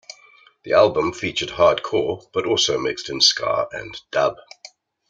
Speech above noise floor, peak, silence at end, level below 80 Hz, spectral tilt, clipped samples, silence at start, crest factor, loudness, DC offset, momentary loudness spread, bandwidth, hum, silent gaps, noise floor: 32 dB; -2 dBFS; 0.75 s; -56 dBFS; -2.5 dB/octave; under 0.1%; 0.65 s; 20 dB; -20 LUFS; under 0.1%; 10 LU; 9.2 kHz; none; none; -52 dBFS